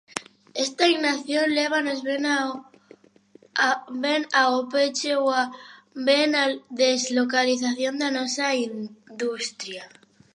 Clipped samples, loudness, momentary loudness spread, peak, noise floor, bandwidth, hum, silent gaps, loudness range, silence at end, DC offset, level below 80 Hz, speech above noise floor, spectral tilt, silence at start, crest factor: under 0.1%; -23 LUFS; 15 LU; -4 dBFS; -55 dBFS; 11.5 kHz; none; none; 3 LU; 0.45 s; under 0.1%; -80 dBFS; 31 dB; -1.5 dB/octave; 0.15 s; 20 dB